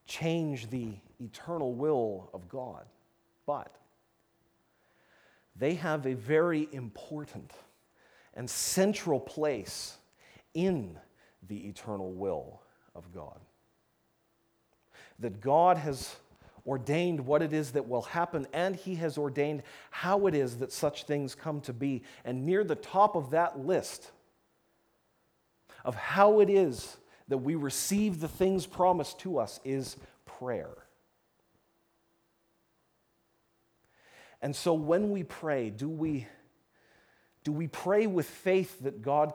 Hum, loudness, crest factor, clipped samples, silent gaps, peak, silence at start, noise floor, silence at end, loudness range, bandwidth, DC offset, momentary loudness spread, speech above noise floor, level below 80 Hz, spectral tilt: none; -31 LUFS; 24 dB; under 0.1%; none; -10 dBFS; 0.1 s; -74 dBFS; 0 s; 13 LU; over 20 kHz; under 0.1%; 16 LU; 43 dB; -66 dBFS; -5.5 dB/octave